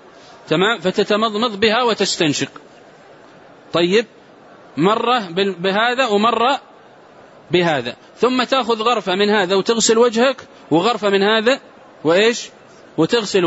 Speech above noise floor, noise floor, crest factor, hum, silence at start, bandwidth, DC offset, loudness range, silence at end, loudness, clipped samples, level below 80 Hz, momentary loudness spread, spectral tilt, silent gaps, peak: 28 dB; -44 dBFS; 16 dB; none; 0.45 s; 8 kHz; under 0.1%; 4 LU; 0 s; -17 LUFS; under 0.1%; -62 dBFS; 8 LU; -4 dB/octave; none; -2 dBFS